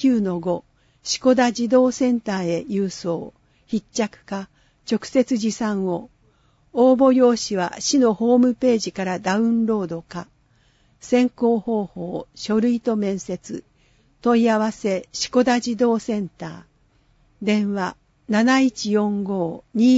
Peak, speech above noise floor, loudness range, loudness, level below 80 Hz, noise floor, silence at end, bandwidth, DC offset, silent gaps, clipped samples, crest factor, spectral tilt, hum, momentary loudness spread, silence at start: -6 dBFS; 40 dB; 6 LU; -21 LUFS; -58 dBFS; -60 dBFS; 0 s; 8 kHz; under 0.1%; none; under 0.1%; 16 dB; -5 dB/octave; none; 13 LU; 0 s